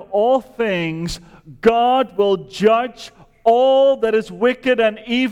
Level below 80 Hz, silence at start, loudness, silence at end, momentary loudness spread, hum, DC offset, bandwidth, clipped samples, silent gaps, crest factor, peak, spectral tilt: -48 dBFS; 0 s; -17 LUFS; 0 s; 11 LU; none; under 0.1%; 12.5 kHz; under 0.1%; none; 14 dB; -2 dBFS; -5.5 dB/octave